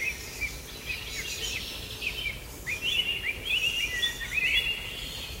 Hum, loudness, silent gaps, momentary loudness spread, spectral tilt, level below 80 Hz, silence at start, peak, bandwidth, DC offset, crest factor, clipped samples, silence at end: none; -29 LUFS; none; 10 LU; -1 dB/octave; -46 dBFS; 0 s; -12 dBFS; 16 kHz; under 0.1%; 18 dB; under 0.1%; 0 s